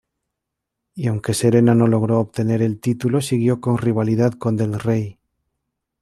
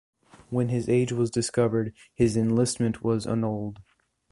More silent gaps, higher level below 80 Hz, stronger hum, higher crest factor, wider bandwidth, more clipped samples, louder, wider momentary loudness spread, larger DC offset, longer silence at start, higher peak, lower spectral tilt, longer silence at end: neither; about the same, -56 dBFS vs -52 dBFS; neither; about the same, 16 dB vs 18 dB; first, 13 kHz vs 11.5 kHz; neither; first, -19 LUFS vs -26 LUFS; about the same, 9 LU vs 7 LU; neither; first, 0.95 s vs 0.5 s; first, -2 dBFS vs -8 dBFS; about the same, -7 dB/octave vs -6.5 dB/octave; first, 0.9 s vs 0.5 s